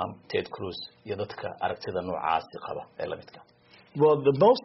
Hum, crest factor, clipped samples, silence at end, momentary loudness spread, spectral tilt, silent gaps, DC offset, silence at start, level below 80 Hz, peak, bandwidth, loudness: none; 20 dB; under 0.1%; 0.05 s; 16 LU; -4.5 dB/octave; none; under 0.1%; 0 s; -66 dBFS; -8 dBFS; 5.8 kHz; -28 LUFS